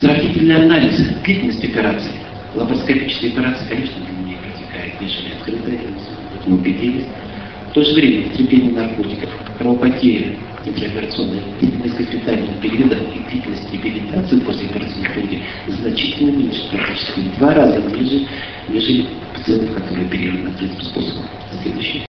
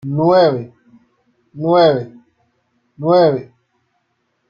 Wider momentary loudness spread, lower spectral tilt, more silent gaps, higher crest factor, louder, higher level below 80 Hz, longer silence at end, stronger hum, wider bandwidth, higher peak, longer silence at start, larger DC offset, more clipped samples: about the same, 13 LU vs 14 LU; about the same, -7.5 dB/octave vs -8.5 dB/octave; neither; about the same, 18 dB vs 16 dB; second, -17 LUFS vs -14 LUFS; first, -40 dBFS vs -60 dBFS; second, 0.1 s vs 1.05 s; neither; about the same, 6.2 kHz vs 6.8 kHz; about the same, 0 dBFS vs -2 dBFS; about the same, 0 s vs 0.05 s; first, 0.3% vs under 0.1%; neither